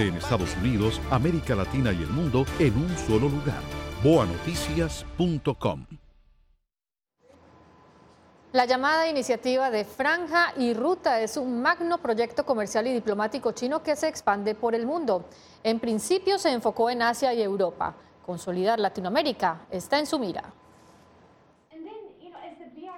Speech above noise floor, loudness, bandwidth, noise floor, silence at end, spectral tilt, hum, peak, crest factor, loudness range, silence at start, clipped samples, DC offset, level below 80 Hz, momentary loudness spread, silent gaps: over 65 dB; -26 LUFS; 16.5 kHz; under -90 dBFS; 0 s; -5.5 dB/octave; none; -8 dBFS; 20 dB; 6 LU; 0 s; under 0.1%; under 0.1%; -44 dBFS; 10 LU; none